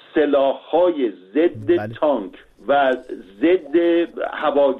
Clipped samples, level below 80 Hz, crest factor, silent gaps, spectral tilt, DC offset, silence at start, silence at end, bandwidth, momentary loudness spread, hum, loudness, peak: under 0.1%; -58 dBFS; 12 dB; none; -8 dB/octave; under 0.1%; 0.15 s; 0 s; 4.1 kHz; 8 LU; none; -19 LUFS; -6 dBFS